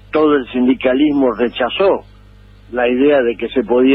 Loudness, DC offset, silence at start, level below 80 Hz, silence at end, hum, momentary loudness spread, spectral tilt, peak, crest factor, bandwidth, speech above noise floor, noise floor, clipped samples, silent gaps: -15 LUFS; under 0.1%; 0.15 s; -44 dBFS; 0 s; 50 Hz at -40 dBFS; 6 LU; -8 dB/octave; -4 dBFS; 12 dB; 5.2 kHz; 28 dB; -42 dBFS; under 0.1%; none